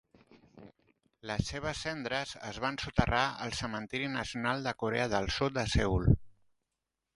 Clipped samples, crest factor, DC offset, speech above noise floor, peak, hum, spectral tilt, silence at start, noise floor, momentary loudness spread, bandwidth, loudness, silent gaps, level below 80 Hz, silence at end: under 0.1%; 24 dB; under 0.1%; 55 dB; -10 dBFS; none; -5 dB/octave; 0.55 s; -87 dBFS; 8 LU; 11.5 kHz; -33 LUFS; none; -44 dBFS; 0.85 s